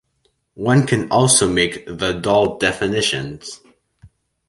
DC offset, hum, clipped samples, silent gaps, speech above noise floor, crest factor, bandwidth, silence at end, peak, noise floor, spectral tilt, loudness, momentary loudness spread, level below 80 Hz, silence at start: under 0.1%; none; under 0.1%; none; 48 dB; 18 dB; 11.5 kHz; 0.4 s; -2 dBFS; -66 dBFS; -4 dB/octave; -17 LUFS; 12 LU; -46 dBFS; 0.55 s